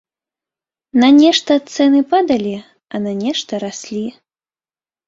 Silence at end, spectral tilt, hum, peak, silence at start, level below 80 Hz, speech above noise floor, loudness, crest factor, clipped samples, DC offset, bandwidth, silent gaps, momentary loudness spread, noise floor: 0.95 s; -4.5 dB/octave; none; -2 dBFS; 0.95 s; -60 dBFS; over 76 dB; -15 LUFS; 14 dB; under 0.1%; under 0.1%; 7.8 kHz; none; 15 LU; under -90 dBFS